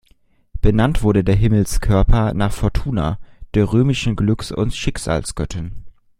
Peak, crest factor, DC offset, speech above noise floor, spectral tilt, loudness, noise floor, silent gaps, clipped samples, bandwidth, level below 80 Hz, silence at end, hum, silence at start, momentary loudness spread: -2 dBFS; 16 dB; under 0.1%; 39 dB; -6.5 dB/octave; -19 LUFS; -55 dBFS; none; under 0.1%; 15.5 kHz; -24 dBFS; 0.3 s; none; 0.55 s; 10 LU